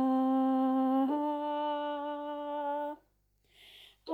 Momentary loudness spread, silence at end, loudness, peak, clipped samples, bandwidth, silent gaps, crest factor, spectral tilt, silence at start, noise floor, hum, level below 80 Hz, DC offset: 10 LU; 0 s; -32 LUFS; -22 dBFS; under 0.1%; 4.5 kHz; none; 10 dB; -6.5 dB/octave; 0 s; -72 dBFS; 50 Hz at -75 dBFS; -76 dBFS; under 0.1%